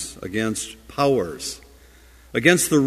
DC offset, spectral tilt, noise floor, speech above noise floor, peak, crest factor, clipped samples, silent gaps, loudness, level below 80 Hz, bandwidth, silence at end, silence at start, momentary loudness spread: under 0.1%; -4 dB/octave; -49 dBFS; 28 dB; 0 dBFS; 22 dB; under 0.1%; none; -22 LUFS; -50 dBFS; 15.5 kHz; 0 s; 0 s; 15 LU